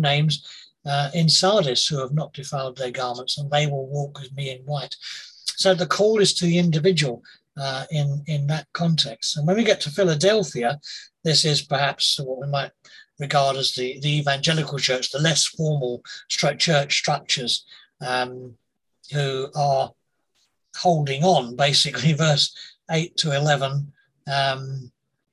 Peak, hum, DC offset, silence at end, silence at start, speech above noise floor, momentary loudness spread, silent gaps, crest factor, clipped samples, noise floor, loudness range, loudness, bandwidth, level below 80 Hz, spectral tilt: -4 dBFS; none; under 0.1%; 0.45 s; 0 s; 47 dB; 13 LU; none; 20 dB; under 0.1%; -69 dBFS; 4 LU; -22 LUFS; 12.5 kHz; -64 dBFS; -4 dB/octave